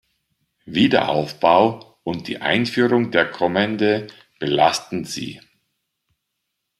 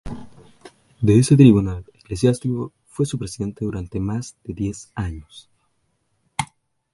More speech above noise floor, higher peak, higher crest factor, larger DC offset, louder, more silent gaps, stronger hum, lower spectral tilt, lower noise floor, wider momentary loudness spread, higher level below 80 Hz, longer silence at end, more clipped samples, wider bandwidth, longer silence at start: first, 58 dB vs 49 dB; about the same, -2 dBFS vs 0 dBFS; about the same, 20 dB vs 22 dB; neither; about the same, -19 LUFS vs -20 LUFS; neither; neither; second, -5 dB/octave vs -7 dB/octave; first, -78 dBFS vs -68 dBFS; second, 12 LU vs 21 LU; second, -60 dBFS vs -42 dBFS; first, 1.4 s vs 0.5 s; neither; first, 13.5 kHz vs 11.5 kHz; first, 0.65 s vs 0.05 s